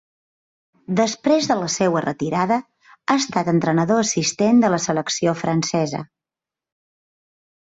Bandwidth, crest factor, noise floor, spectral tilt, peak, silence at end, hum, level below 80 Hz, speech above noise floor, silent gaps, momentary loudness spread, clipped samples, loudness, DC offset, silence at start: 8 kHz; 16 dB; -89 dBFS; -4.5 dB/octave; -4 dBFS; 1.7 s; none; -60 dBFS; 70 dB; none; 7 LU; under 0.1%; -20 LUFS; under 0.1%; 0.9 s